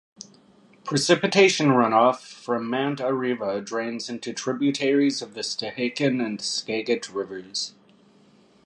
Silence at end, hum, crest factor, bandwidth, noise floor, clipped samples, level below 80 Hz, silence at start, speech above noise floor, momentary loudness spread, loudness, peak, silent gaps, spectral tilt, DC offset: 0.95 s; none; 22 dB; 11.5 kHz; -56 dBFS; under 0.1%; -72 dBFS; 0.2 s; 33 dB; 13 LU; -24 LUFS; -4 dBFS; none; -4 dB/octave; under 0.1%